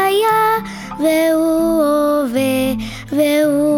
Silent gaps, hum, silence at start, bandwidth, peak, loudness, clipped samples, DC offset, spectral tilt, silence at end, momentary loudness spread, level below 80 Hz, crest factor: none; none; 0 s; 19 kHz; -4 dBFS; -15 LUFS; under 0.1%; under 0.1%; -4.5 dB/octave; 0 s; 7 LU; -44 dBFS; 10 dB